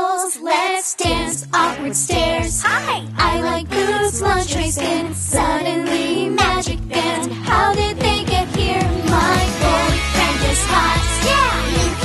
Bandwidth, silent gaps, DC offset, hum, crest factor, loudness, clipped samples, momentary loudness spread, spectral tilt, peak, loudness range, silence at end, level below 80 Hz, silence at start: 12.5 kHz; none; under 0.1%; none; 14 dB; -17 LUFS; under 0.1%; 5 LU; -3.5 dB/octave; -4 dBFS; 2 LU; 0 s; -28 dBFS; 0 s